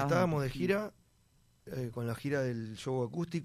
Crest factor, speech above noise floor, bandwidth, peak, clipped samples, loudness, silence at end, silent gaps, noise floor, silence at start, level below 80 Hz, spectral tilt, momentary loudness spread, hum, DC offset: 18 dB; 35 dB; 15.5 kHz; -16 dBFS; under 0.1%; -35 LUFS; 0 s; none; -68 dBFS; 0 s; -60 dBFS; -7 dB/octave; 10 LU; none; under 0.1%